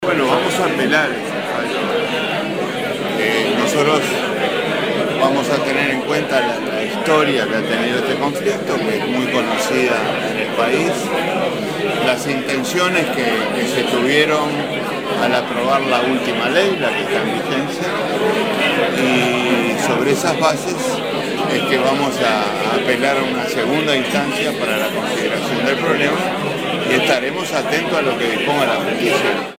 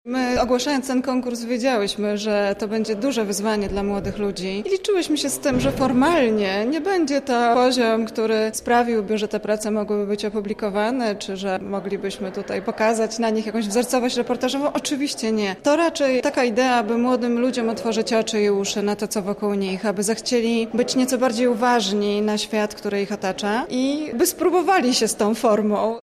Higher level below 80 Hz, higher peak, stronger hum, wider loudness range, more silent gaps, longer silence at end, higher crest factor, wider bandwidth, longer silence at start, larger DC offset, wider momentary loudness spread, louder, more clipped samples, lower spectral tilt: second, -64 dBFS vs -48 dBFS; first, 0 dBFS vs -8 dBFS; neither; second, 1 LU vs 4 LU; neither; about the same, 0.05 s vs 0.05 s; about the same, 16 dB vs 14 dB; about the same, 17 kHz vs 15.5 kHz; about the same, 0 s vs 0.05 s; first, 0.2% vs under 0.1%; about the same, 5 LU vs 7 LU; first, -17 LUFS vs -21 LUFS; neither; about the same, -4 dB/octave vs -4 dB/octave